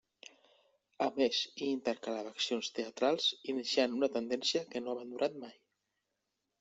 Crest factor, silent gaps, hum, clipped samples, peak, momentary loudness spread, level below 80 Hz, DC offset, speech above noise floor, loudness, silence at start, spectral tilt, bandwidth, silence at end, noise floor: 22 dB; none; none; under 0.1%; -16 dBFS; 9 LU; -82 dBFS; under 0.1%; 51 dB; -34 LUFS; 1 s; -2.5 dB/octave; 8.2 kHz; 1.1 s; -86 dBFS